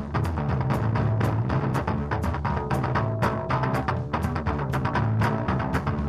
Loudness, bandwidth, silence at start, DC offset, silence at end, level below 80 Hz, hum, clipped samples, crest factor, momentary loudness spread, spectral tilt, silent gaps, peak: -26 LUFS; 14 kHz; 0 s; 0.2%; 0 s; -36 dBFS; none; under 0.1%; 16 dB; 3 LU; -8 dB/octave; none; -10 dBFS